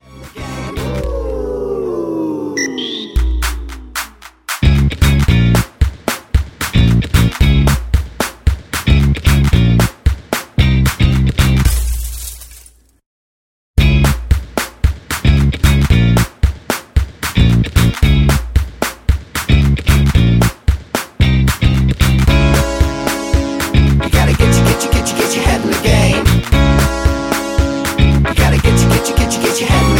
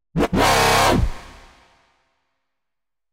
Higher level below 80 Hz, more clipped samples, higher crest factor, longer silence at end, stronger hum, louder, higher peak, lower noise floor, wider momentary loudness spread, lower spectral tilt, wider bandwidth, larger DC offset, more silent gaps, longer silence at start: first, -16 dBFS vs -32 dBFS; neither; second, 12 dB vs 18 dB; second, 0 s vs 1.8 s; neither; first, -14 LUFS vs -17 LUFS; first, 0 dBFS vs -4 dBFS; second, -43 dBFS vs -87 dBFS; about the same, 9 LU vs 7 LU; first, -5.5 dB/octave vs -4 dB/octave; about the same, 17 kHz vs 16 kHz; neither; first, 13.06-13.74 s vs none; about the same, 0.15 s vs 0.15 s